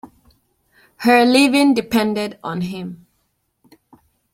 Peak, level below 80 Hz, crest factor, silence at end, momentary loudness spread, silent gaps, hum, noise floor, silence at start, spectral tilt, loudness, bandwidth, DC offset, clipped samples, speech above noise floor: -2 dBFS; -58 dBFS; 18 dB; 1.4 s; 14 LU; none; none; -68 dBFS; 0.05 s; -4.5 dB/octave; -16 LUFS; 16.5 kHz; under 0.1%; under 0.1%; 52 dB